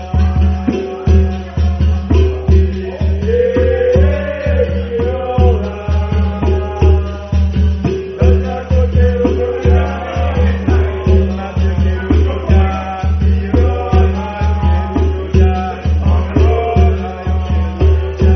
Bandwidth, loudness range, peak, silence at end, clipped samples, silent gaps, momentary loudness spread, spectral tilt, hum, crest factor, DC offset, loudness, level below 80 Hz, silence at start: 6.2 kHz; 1 LU; 0 dBFS; 0 s; under 0.1%; none; 5 LU; -8 dB/octave; none; 12 dB; under 0.1%; -14 LUFS; -18 dBFS; 0 s